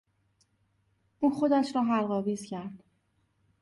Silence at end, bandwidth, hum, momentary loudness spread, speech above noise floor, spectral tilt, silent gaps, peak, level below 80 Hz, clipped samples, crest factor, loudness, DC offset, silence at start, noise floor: 0.85 s; 11.5 kHz; none; 14 LU; 45 dB; -6.5 dB/octave; none; -14 dBFS; -74 dBFS; under 0.1%; 16 dB; -29 LUFS; under 0.1%; 1.2 s; -73 dBFS